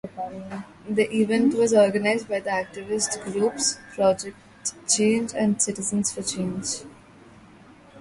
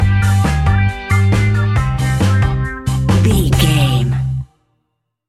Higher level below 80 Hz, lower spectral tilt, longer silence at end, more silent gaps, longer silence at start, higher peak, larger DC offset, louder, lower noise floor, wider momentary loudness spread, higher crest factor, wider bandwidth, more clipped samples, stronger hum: second, -60 dBFS vs -24 dBFS; second, -3.5 dB/octave vs -6 dB/octave; second, 0 s vs 0.85 s; neither; about the same, 0.05 s vs 0 s; second, -6 dBFS vs 0 dBFS; neither; second, -24 LUFS vs -14 LUFS; second, -50 dBFS vs -70 dBFS; first, 14 LU vs 7 LU; first, 20 dB vs 14 dB; second, 11.5 kHz vs 14 kHz; neither; neither